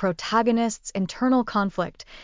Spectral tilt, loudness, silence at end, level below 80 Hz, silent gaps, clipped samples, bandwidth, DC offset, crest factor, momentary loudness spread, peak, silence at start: -5 dB/octave; -24 LUFS; 0 s; -54 dBFS; none; under 0.1%; 7.6 kHz; under 0.1%; 16 dB; 8 LU; -8 dBFS; 0 s